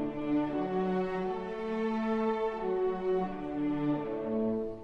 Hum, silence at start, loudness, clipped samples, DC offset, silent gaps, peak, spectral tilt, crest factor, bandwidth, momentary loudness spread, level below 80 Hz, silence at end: none; 0 s; -32 LUFS; under 0.1%; under 0.1%; none; -20 dBFS; -8.5 dB/octave; 12 dB; 6.8 kHz; 4 LU; -56 dBFS; 0 s